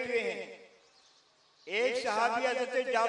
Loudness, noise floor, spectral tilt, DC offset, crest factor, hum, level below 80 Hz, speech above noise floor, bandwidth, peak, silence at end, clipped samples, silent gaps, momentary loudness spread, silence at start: -31 LUFS; -66 dBFS; -2 dB/octave; under 0.1%; 18 dB; none; -82 dBFS; 35 dB; 10.5 kHz; -14 dBFS; 0 s; under 0.1%; none; 18 LU; 0 s